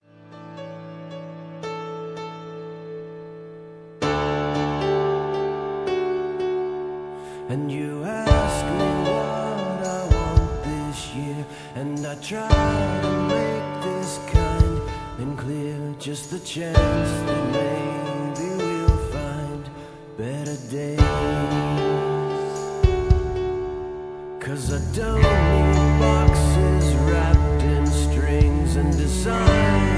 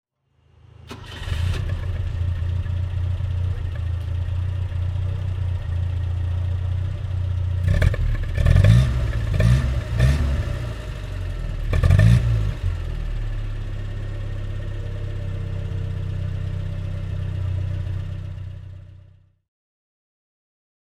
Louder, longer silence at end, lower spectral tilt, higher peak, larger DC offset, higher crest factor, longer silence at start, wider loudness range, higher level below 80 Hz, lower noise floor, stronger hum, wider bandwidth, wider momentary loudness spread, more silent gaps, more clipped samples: about the same, -23 LUFS vs -24 LUFS; second, 0 s vs 1.9 s; about the same, -6.5 dB/octave vs -7.5 dB/octave; about the same, -2 dBFS vs -2 dBFS; neither; about the same, 20 dB vs 20 dB; second, 0.25 s vs 0.8 s; second, 7 LU vs 10 LU; about the same, -26 dBFS vs -28 dBFS; second, -43 dBFS vs -61 dBFS; neither; about the same, 11 kHz vs 11 kHz; first, 16 LU vs 12 LU; neither; neither